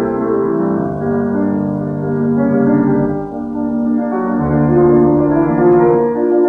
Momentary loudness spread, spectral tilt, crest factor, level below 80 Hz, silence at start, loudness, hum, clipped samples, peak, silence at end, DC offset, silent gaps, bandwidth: 8 LU; -12 dB/octave; 12 dB; -40 dBFS; 0 s; -14 LUFS; none; under 0.1%; -2 dBFS; 0 s; under 0.1%; none; 2.6 kHz